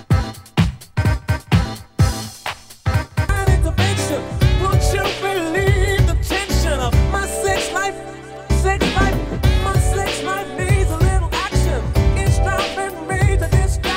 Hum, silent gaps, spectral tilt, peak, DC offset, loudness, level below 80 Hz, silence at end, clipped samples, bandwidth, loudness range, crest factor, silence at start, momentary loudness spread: none; none; -5 dB/octave; -2 dBFS; under 0.1%; -19 LUFS; -22 dBFS; 0 s; under 0.1%; 16 kHz; 2 LU; 14 dB; 0 s; 6 LU